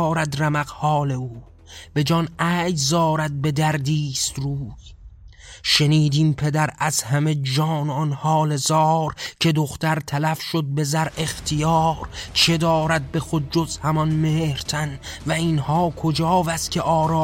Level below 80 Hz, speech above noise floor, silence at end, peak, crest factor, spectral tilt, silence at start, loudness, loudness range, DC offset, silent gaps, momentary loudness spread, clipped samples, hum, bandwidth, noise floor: -46 dBFS; 22 dB; 0 s; -4 dBFS; 18 dB; -5 dB/octave; 0 s; -21 LUFS; 2 LU; under 0.1%; none; 7 LU; under 0.1%; none; 16.5 kHz; -43 dBFS